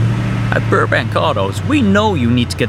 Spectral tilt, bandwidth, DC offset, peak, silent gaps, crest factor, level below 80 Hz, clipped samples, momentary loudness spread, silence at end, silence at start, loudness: -6.5 dB/octave; 14 kHz; under 0.1%; 0 dBFS; none; 14 dB; -34 dBFS; under 0.1%; 4 LU; 0 s; 0 s; -14 LUFS